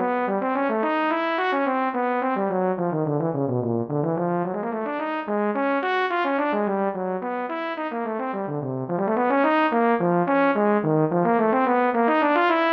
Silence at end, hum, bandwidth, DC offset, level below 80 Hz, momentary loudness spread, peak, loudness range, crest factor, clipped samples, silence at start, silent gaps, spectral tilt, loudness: 0 s; none; 6.2 kHz; under 0.1%; -70 dBFS; 8 LU; -6 dBFS; 5 LU; 16 dB; under 0.1%; 0 s; none; -9 dB/octave; -23 LUFS